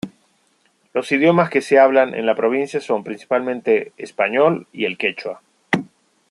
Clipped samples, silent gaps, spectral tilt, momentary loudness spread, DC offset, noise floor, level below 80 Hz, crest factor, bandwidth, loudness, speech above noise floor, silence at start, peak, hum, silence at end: under 0.1%; none; -6 dB/octave; 12 LU; under 0.1%; -62 dBFS; -66 dBFS; 18 dB; 11 kHz; -18 LUFS; 44 dB; 0.05 s; -2 dBFS; none; 0.45 s